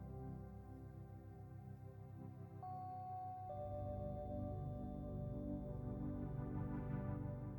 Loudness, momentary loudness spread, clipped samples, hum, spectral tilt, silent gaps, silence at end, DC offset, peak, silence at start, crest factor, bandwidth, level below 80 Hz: -49 LUFS; 10 LU; under 0.1%; none; -11 dB/octave; none; 0 s; under 0.1%; -34 dBFS; 0 s; 14 dB; 18.5 kHz; -58 dBFS